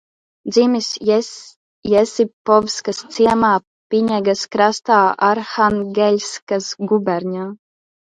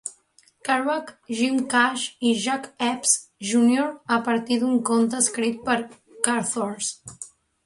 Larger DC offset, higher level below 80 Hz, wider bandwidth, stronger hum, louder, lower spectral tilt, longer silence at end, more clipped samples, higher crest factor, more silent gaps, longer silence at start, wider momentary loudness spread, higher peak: neither; first, -56 dBFS vs -68 dBFS; second, 9.4 kHz vs 11.5 kHz; neither; first, -17 LUFS vs -23 LUFS; first, -4.5 dB/octave vs -2.5 dB/octave; first, 0.55 s vs 0.4 s; neither; second, 16 dB vs 24 dB; first, 1.56-1.82 s, 2.33-2.45 s, 3.67-3.90 s, 6.42-6.47 s vs none; first, 0.45 s vs 0.05 s; about the same, 10 LU vs 12 LU; about the same, 0 dBFS vs 0 dBFS